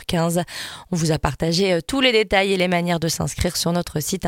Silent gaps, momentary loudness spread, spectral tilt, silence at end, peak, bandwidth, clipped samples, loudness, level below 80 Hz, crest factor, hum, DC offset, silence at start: none; 7 LU; -4.5 dB/octave; 0 s; -2 dBFS; 17 kHz; under 0.1%; -20 LUFS; -40 dBFS; 20 dB; none; under 0.1%; 0 s